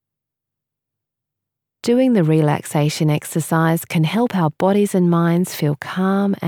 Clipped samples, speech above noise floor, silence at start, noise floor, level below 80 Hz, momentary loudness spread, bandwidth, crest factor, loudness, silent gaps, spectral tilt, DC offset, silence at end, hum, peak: under 0.1%; 67 dB; 1.85 s; -84 dBFS; -70 dBFS; 6 LU; 18.5 kHz; 14 dB; -18 LUFS; none; -6.5 dB/octave; under 0.1%; 0 s; none; -4 dBFS